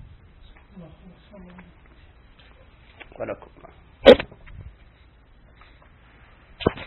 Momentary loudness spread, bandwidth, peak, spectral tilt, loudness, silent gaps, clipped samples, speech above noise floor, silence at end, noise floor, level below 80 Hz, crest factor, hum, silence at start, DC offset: 31 LU; 4.2 kHz; 0 dBFS; -3 dB/octave; -18 LUFS; none; under 0.1%; 13 dB; 0.05 s; -53 dBFS; -46 dBFS; 26 dB; none; 3.2 s; under 0.1%